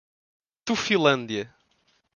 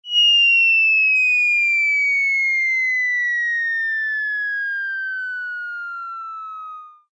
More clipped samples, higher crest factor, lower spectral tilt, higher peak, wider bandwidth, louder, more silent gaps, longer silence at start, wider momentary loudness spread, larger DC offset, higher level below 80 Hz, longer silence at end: neither; first, 22 dB vs 10 dB; first, -4 dB/octave vs 10 dB/octave; first, -4 dBFS vs -10 dBFS; first, 10 kHz vs 8 kHz; second, -24 LUFS vs -16 LUFS; neither; first, 0.65 s vs 0.05 s; about the same, 16 LU vs 18 LU; neither; first, -64 dBFS vs under -90 dBFS; first, 0.7 s vs 0.2 s